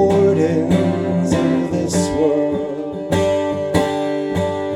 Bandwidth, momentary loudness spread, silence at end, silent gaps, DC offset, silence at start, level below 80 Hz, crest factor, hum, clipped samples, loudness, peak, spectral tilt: 14 kHz; 6 LU; 0 s; none; under 0.1%; 0 s; -44 dBFS; 16 dB; none; under 0.1%; -18 LUFS; -2 dBFS; -6.5 dB/octave